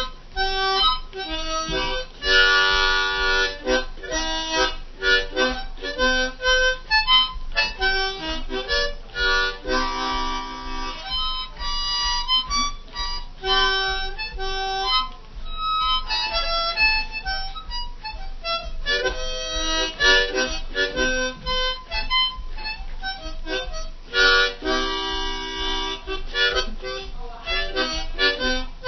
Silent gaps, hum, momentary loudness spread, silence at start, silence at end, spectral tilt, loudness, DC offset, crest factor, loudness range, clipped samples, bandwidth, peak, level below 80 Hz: none; none; 14 LU; 0 s; 0 s; -1.5 dB/octave; -22 LUFS; under 0.1%; 18 dB; 4 LU; under 0.1%; 6.6 kHz; -4 dBFS; -34 dBFS